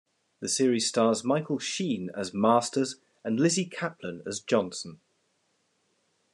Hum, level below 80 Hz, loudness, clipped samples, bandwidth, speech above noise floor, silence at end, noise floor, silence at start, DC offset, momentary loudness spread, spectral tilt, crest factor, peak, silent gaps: none; -78 dBFS; -28 LUFS; under 0.1%; 12.5 kHz; 45 dB; 1.4 s; -73 dBFS; 0.4 s; under 0.1%; 12 LU; -4 dB/octave; 20 dB; -8 dBFS; none